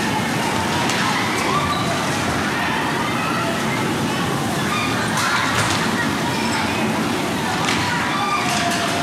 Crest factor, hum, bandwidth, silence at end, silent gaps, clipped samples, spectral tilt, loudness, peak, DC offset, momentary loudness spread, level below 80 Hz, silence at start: 18 dB; none; 16.5 kHz; 0 s; none; under 0.1%; -3.5 dB/octave; -19 LUFS; -2 dBFS; under 0.1%; 2 LU; -46 dBFS; 0 s